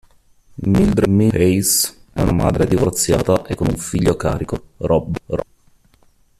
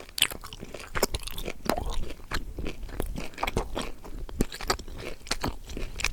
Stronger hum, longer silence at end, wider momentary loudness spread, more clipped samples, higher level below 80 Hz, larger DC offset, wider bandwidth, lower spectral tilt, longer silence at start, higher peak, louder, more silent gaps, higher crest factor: neither; first, 0.95 s vs 0 s; about the same, 10 LU vs 11 LU; neither; about the same, -34 dBFS vs -36 dBFS; neither; second, 14.5 kHz vs over 20 kHz; first, -5.5 dB/octave vs -3 dB/octave; first, 0.6 s vs 0 s; about the same, -2 dBFS vs -2 dBFS; first, -17 LUFS vs -33 LUFS; neither; second, 16 dB vs 30 dB